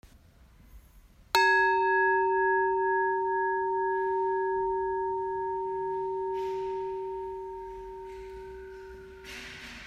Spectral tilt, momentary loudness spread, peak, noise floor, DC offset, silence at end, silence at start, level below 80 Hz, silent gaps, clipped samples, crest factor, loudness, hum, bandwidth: -4 dB/octave; 19 LU; -8 dBFS; -57 dBFS; under 0.1%; 0 s; 0.05 s; -58 dBFS; none; under 0.1%; 22 dB; -28 LUFS; none; 15.5 kHz